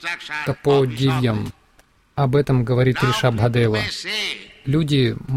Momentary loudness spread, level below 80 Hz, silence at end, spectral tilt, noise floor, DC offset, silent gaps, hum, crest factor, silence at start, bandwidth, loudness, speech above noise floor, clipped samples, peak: 8 LU; -44 dBFS; 0 s; -6.5 dB/octave; -56 dBFS; under 0.1%; none; none; 14 dB; 0 s; 14.5 kHz; -20 LUFS; 37 dB; under 0.1%; -6 dBFS